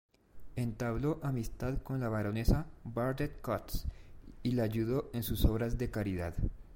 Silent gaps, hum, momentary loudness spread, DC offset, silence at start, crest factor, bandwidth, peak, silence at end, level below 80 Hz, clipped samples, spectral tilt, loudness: none; none; 8 LU; under 0.1%; 0.35 s; 20 dB; 16.5 kHz; -14 dBFS; 0 s; -42 dBFS; under 0.1%; -7 dB/octave; -36 LUFS